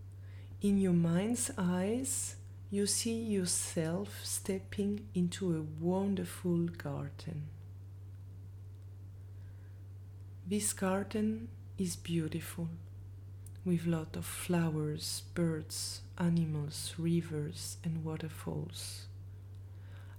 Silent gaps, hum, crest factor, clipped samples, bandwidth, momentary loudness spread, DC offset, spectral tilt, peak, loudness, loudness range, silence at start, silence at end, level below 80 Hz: none; none; 16 dB; under 0.1%; 19 kHz; 18 LU; under 0.1%; -5 dB/octave; -20 dBFS; -35 LUFS; 7 LU; 0 s; 0 s; -62 dBFS